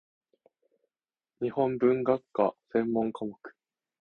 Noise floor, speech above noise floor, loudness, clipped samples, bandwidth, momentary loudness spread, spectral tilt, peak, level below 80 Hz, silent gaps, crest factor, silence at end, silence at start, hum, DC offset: under -90 dBFS; over 62 dB; -29 LUFS; under 0.1%; 4.4 kHz; 13 LU; -9.5 dB/octave; -10 dBFS; -70 dBFS; none; 20 dB; 0.5 s; 1.4 s; none; under 0.1%